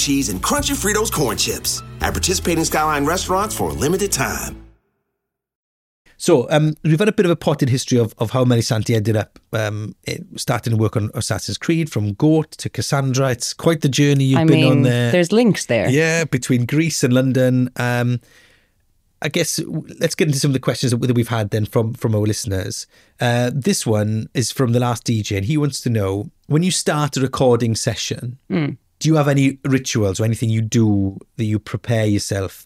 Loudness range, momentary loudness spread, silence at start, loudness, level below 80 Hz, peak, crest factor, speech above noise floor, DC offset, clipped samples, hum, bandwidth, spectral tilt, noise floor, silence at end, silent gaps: 5 LU; 8 LU; 0 s; -18 LUFS; -42 dBFS; -2 dBFS; 16 dB; 60 dB; under 0.1%; under 0.1%; none; 16.5 kHz; -5 dB/octave; -78 dBFS; 0.05 s; 5.55-6.05 s